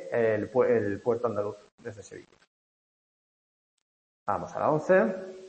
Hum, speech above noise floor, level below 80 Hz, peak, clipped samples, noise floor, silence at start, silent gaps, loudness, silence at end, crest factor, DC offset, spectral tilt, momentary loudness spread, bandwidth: none; over 63 dB; -70 dBFS; -12 dBFS; under 0.1%; under -90 dBFS; 0 s; 1.72-1.78 s, 2.47-4.26 s; -27 LUFS; 0 s; 18 dB; under 0.1%; -7.5 dB/octave; 20 LU; 8.6 kHz